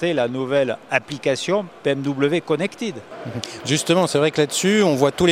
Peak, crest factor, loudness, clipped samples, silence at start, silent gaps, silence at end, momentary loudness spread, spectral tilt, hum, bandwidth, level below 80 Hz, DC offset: 0 dBFS; 20 dB; -20 LUFS; under 0.1%; 0 s; none; 0 s; 12 LU; -4.5 dB/octave; none; 16 kHz; -54 dBFS; under 0.1%